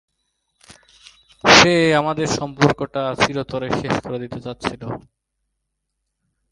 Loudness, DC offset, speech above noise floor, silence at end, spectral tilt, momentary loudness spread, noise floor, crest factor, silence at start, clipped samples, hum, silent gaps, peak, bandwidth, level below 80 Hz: -17 LUFS; under 0.1%; 56 dB; 1.55 s; -4 dB/octave; 19 LU; -76 dBFS; 20 dB; 1.45 s; under 0.1%; none; none; 0 dBFS; 11.5 kHz; -48 dBFS